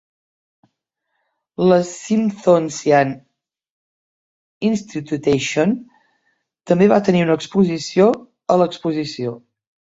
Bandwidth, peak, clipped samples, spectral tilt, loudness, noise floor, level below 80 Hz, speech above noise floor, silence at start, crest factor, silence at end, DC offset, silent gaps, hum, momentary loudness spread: 8 kHz; 0 dBFS; under 0.1%; -6 dB/octave; -18 LUFS; -75 dBFS; -60 dBFS; 58 dB; 1.6 s; 18 dB; 0.6 s; under 0.1%; 3.70-4.61 s; none; 11 LU